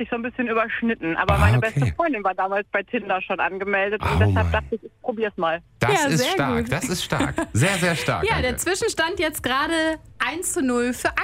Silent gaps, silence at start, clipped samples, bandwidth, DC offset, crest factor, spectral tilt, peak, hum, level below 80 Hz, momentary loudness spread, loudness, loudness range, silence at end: none; 0 s; under 0.1%; 16 kHz; under 0.1%; 18 dB; -4.5 dB/octave; -4 dBFS; none; -38 dBFS; 6 LU; -22 LUFS; 1 LU; 0 s